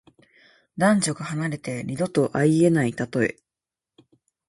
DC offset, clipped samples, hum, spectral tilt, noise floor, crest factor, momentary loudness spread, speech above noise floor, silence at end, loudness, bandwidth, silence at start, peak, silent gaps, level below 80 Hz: under 0.1%; under 0.1%; none; -6 dB/octave; -89 dBFS; 18 dB; 10 LU; 67 dB; 1.15 s; -23 LUFS; 11.5 kHz; 0.75 s; -6 dBFS; none; -60 dBFS